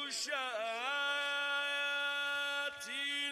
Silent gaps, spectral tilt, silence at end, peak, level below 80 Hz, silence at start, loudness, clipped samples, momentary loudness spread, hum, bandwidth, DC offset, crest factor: none; 1.5 dB/octave; 0 s; -24 dBFS; -86 dBFS; 0 s; -35 LUFS; under 0.1%; 4 LU; none; 16 kHz; under 0.1%; 14 dB